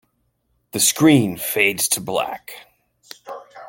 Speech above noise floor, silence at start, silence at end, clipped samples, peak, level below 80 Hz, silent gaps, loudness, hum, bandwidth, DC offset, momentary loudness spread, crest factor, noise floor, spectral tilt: 49 dB; 0.75 s; 0 s; under 0.1%; -2 dBFS; -60 dBFS; none; -18 LUFS; none; 17 kHz; under 0.1%; 22 LU; 20 dB; -68 dBFS; -3.5 dB/octave